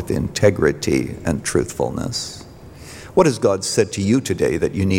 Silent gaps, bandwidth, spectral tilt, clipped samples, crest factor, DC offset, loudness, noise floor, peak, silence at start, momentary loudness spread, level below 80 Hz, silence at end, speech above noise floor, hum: none; 17 kHz; -5 dB/octave; under 0.1%; 18 dB; under 0.1%; -19 LUFS; -39 dBFS; -2 dBFS; 0 s; 13 LU; -42 dBFS; 0 s; 20 dB; none